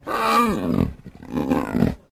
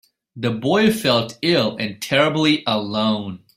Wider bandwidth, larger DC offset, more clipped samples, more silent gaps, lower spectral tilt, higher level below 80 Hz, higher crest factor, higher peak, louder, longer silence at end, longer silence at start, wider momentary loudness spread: about the same, 16 kHz vs 16 kHz; neither; neither; neither; first, -6.5 dB/octave vs -5 dB/octave; first, -40 dBFS vs -58 dBFS; about the same, 16 dB vs 18 dB; second, -6 dBFS vs -2 dBFS; second, -22 LUFS vs -19 LUFS; about the same, 0.15 s vs 0.2 s; second, 0.05 s vs 0.35 s; about the same, 10 LU vs 9 LU